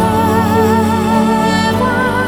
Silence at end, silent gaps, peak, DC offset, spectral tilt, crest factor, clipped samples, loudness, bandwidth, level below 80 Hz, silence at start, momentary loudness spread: 0 s; none; 0 dBFS; under 0.1%; -6 dB/octave; 12 dB; under 0.1%; -12 LUFS; 18.5 kHz; -36 dBFS; 0 s; 2 LU